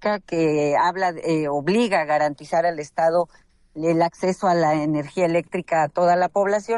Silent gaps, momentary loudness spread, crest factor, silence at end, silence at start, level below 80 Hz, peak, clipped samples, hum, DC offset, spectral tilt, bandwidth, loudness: none; 5 LU; 12 dB; 0 s; 0 s; -60 dBFS; -8 dBFS; under 0.1%; none; under 0.1%; -6 dB/octave; 11.5 kHz; -21 LUFS